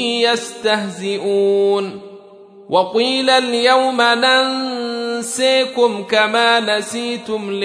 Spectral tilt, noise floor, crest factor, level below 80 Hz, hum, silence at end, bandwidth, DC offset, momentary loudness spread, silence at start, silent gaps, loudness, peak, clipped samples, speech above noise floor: -2.5 dB/octave; -41 dBFS; 16 dB; -68 dBFS; none; 0 s; 11 kHz; under 0.1%; 9 LU; 0 s; none; -16 LUFS; 0 dBFS; under 0.1%; 25 dB